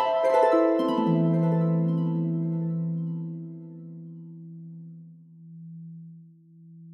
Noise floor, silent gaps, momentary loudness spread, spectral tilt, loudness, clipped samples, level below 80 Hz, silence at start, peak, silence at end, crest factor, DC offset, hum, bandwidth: -51 dBFS; none; 22 LU; -9.5 dB/octave; -25 LUFS; under 0.1%; -72 dBFS; 0 s; -8 dBFS; 0 s; 18 dB; under 0.1%; none; 6.2 kHz